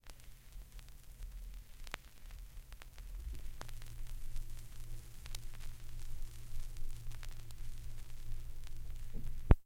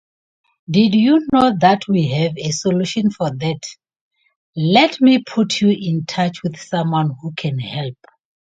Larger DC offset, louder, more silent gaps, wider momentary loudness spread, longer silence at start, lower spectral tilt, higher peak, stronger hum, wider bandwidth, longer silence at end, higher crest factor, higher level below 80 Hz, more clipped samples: neither; second, -50 LUFS vs -17 LUFS; second, none vs 3.96-4.11 s, 4.36-4.53 s; second, 7 LU vs 12 LU; second, 0.05 s vs 0.7 s; about the same, -5.5 dB/octave vs -6 dB/octave; second, -6 dBFS vs 0 dBFS; neither; first, 16 kHz vs 9.2 kHz; second, 0 s vs 0.6 s; first, 32 dB vs 18 dB; first, -42 dBFS vs -56 dBFS; neither